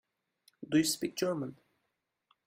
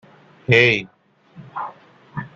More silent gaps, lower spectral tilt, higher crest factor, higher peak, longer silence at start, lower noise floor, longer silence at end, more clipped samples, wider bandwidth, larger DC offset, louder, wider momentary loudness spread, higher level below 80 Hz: neither; second, -4 dB/octave vs -5.5 dB/octave; about the same, 20 dB vs 22 dB; second, -16 dBFS vs -2 dBFS; about the same, 0.6 s vs 0.5 s; first, -83 dBFS vs -44 dBFS; first, 0.95 s vs 0.1 s; neither; first, 16 kHz vs 7.4 kHz; neither; second, -32 LUFS vs -16 LUFS; second, 14 LU vs 21 LU; second, -74 dBFS vs -58 dBFS